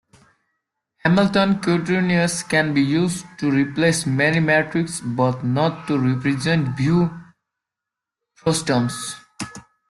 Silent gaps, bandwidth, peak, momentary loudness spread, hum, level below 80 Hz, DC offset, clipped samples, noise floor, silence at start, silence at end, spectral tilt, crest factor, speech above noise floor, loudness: none; 12.5 kHz; -4 dBFS; 7 LU; none; -56 dBFS; under 0.1%; under 0.1%; -86 dBFS; 1.05 s; 0.3 s; -5.5 dB/octave; 16 dB; 67 dB; -20 LUFS